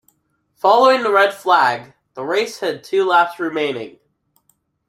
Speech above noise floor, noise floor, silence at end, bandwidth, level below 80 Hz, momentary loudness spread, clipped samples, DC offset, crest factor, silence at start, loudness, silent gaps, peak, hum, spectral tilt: 49 dB; -65 dBFS; 1 s; 15.5 kHz; -70 dBFS; 16 LU; under 0.1%; under 0.1%; 18 dB; 0.65 s; -16 LUFS; none; 0 dBFS; none; -3.5 dB/octave